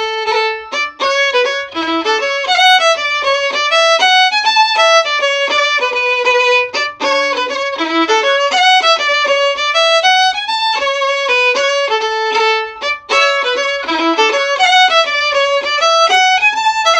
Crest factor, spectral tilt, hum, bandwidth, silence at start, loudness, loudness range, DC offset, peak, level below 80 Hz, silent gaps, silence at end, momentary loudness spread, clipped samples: 12 dB; 0.5 dB/octave; none; 12 kHz; 0 s; -11 LUFS; 3 LU; under 0.1%; 0 dBFS; -56 dBFS; none; 0 s; 7 LU; under 0.1%